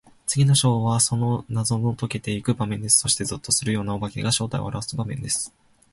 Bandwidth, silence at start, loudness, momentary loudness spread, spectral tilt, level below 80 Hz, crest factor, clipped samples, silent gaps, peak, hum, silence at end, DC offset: 12 kHz; 0.25 s; -22 LUFS; 11 LU; -4 dB/octave; -50 dBFS; 20 dB; under 0.1%; none; -4 dBFS; none; 0.45 s; under 0.1%